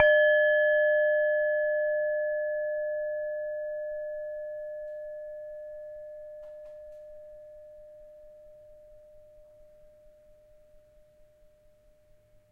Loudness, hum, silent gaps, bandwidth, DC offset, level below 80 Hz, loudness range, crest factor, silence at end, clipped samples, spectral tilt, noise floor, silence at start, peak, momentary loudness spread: -28 LUFS; none; none; 3.4 kHz; under 0.1%; -66 dBFS; 25 LU; 24 dB; 3.3 s; under 0.1%; -3 dB/octave; -61 dBFS; 0 s; -6 dBFS; 25 LU